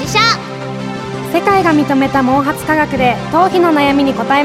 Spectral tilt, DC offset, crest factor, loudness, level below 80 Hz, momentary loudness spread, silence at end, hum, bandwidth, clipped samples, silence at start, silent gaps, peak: -5 dB/octave; under 0.1%; 12 dB; -13 LUFS; -40 dBFS; 11 LU; 0 s; none; 15.5 kHz; under 0.1%; 0 s; none; 0 dBFS